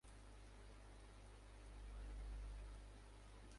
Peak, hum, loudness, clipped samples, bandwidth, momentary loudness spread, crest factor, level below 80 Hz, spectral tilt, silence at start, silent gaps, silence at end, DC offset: -44 dBFS; none; -60 LUFS; under 0.1%; 11.5 kHz; 8 LU; 12 dB; -56 dBFS; -5 dB/octave; 0.05 s; none; 0 s; under 0.1%